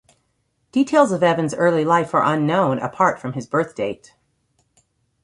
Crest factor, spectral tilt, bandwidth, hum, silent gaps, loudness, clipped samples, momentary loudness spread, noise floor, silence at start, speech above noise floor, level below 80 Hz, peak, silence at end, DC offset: 18 dB; -6 dB/octave; 11.5 kHz; none; none; -19 LUFS; under 0.1%; 10 LU; -68 dBFS; 0.75 s; 50 dB; -62 dBFS; -2 dBFS; 1.3 s; under 0.1%